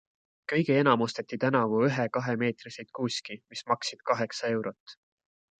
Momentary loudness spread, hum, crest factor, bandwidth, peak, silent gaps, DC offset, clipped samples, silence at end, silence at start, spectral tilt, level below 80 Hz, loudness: 15 LU; none; 22 dB; 9.2 kHz; -8 dBFS; 4.80-4.86 s; under 0.1%; under 0.1%; 0.65 s; 0.5 s; -5.5 dB/octave; -74 dBFS; -28 LUFS